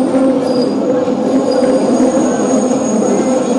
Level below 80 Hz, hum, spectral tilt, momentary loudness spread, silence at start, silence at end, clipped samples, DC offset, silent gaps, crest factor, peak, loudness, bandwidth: -52 dBFS; none; -5.5 dB/octave; 2 LU; 0 s; 0 s; under 0.1%; under 0.1%; none; 10 dB; -2 dBFS; -13 LUFS; 11 kHz